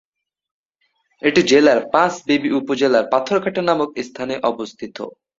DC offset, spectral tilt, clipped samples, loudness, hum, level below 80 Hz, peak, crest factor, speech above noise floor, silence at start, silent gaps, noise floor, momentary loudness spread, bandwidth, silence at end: under 0.1%; -4.5 dB/octave; under 0.1%; -17 LUFS; none; -60 dBFS; 0 dBFS; 18 dB; 51 dB; 1.25 s; none; -68 dBFS; 15 LU; 7.8 kHz; 0.3 s